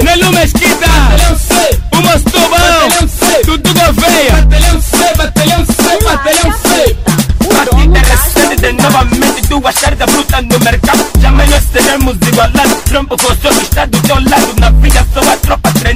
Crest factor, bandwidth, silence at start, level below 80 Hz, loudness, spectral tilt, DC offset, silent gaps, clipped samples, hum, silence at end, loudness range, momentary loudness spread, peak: 8 dB; 16.5 kHz; 0 s; -12 dBFS; -8 LUFS; -4 dB/octave; 0.4%; none; 0.4%; none; 0 s; 1 LU; 3 LU; 0 dBFS